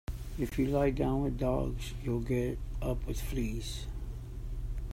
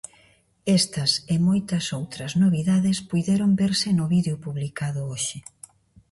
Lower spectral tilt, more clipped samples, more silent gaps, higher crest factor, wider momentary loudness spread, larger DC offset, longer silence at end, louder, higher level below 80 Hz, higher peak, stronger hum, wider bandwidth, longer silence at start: first, -7 dB/octave vs -5 dB/octave; neither; neither; about the same, 16 dB vs 16 dB; first, 13 LU vs 10 LU; neither; second, 0 s vs 0.7 s; second, -35 LUFS vs -23 LUFS; first, -38 dBFS vs -56 dBFS; second, -16 dBFS vs -8 dBFS; neither; first, 16 kHz vs 11.5 kHz; second, 0.1 s vs 0.65 s